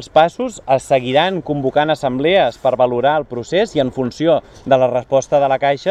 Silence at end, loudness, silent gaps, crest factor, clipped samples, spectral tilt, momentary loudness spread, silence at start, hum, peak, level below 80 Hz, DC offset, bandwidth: 0 s; -16 LUFS; none; 16 dB; under 0.1%; -5.5 dB/octave; 5 LU; 0 s; none; 0 dBFS; -48 dBFS; under 0.1%; 11.5 kHz